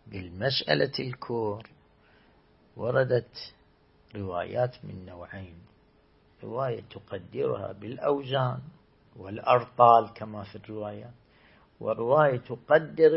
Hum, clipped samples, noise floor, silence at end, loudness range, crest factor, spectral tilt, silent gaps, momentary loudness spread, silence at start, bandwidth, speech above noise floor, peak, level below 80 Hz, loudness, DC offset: none; under 0.1%; -62 dBFS; 0 s; 10 LU; 24 dB; -9.5 dB/octave; none; 20 LU; 0.05 s; 5.8 kHz; 35 dB; -4 dBFS; -64 dBFS; -27 LUFS; under 0.1%